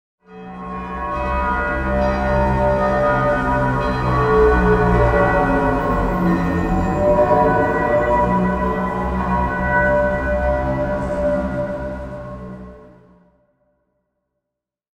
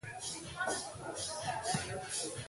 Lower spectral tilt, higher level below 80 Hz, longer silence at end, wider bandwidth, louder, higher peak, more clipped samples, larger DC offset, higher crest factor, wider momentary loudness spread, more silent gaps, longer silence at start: first, -8.5 dB/octave vs -2.5 dB/octave; first, -28 dBFS vs -62 dBFS; first, 2.1 s vs 0 s; second, 9.8 kHz vs 12 kHz; first, -18 LUFS vs -38 LUFS; first, -2 dBFS vs -22 dBFS; neither; neither; about the same, 16 dB vs 18 dB; first, 13 LU vs 5 LU; neither; first, 0.3 s vs 0.05 s